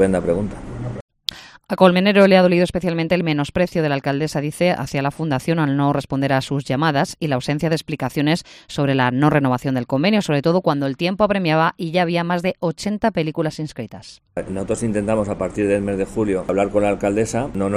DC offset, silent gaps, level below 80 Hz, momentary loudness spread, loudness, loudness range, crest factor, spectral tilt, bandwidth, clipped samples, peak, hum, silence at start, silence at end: under 0.1%; 1.01-1.08 s; -46 dBFS; 12 LU; -19 LUFS; 5 LU; 18 dB; -6.5 dB/octave; 14.5 kHz; under 0.1%; 0 dBFS; none; 0 s; 0 s